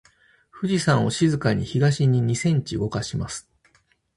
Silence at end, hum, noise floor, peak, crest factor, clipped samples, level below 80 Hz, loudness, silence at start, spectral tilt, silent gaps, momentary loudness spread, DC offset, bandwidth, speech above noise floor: 0.75 s; none; -63 dBFS; -6 dBFS; 18 dB; under 0.1%; -50 dBFS; -23 LUFS; 0.55 s; -6 dB/octave; none; 10 LU; under 0.1%; 11.5 kHz; 42 dB